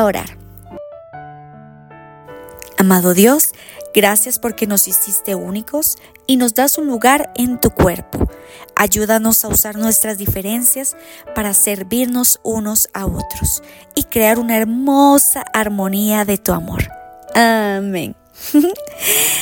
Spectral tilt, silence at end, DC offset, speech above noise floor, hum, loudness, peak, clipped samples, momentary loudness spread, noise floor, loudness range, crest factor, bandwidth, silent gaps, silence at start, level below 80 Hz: -3.5 dB/octave; 0 s; under 0.1%; 24 dB; none; -14 LUFS; 0 dBFS; under 0.1%; 12 LU; -39 dBFS; 3 LU; 16 dB; 17.5 kHz; none; 0 s; -36 dBFS